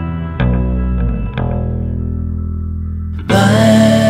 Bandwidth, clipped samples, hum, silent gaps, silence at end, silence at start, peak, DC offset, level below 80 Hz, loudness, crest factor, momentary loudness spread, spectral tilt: 15.5 kHz; under 0.1%; none; none; 0 s; 0 s; 0 dBFS; under 0.1%; -22 dBFS; -15 LUFS; 14 dB; 13 LU; -6.5 dB/octave